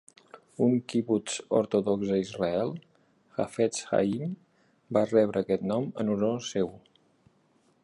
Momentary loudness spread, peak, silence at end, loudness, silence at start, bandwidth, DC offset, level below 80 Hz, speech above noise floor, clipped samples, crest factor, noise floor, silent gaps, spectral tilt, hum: 9 LU; -10 dBFS; 1.05 s; -28 LUFS; 0.35 s; 11.5 kHz; under 0.1%; -66 dBFS; 39 dB; under 0.1%; 18 dB; -67 dBFS; none; -6 dB/octave; none